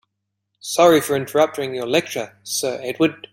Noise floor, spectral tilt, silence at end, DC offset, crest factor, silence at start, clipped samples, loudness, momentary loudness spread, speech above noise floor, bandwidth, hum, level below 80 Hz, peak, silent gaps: -77 dBFS; -4 dB/octave; 0.15 s; under 0.1%; 18 dB; 0.65 s; under 0.1%; -19 LUFS; 12 LU; 58 dB; 16.5 kHz; none; -62 dBFS; -2 dBFS; none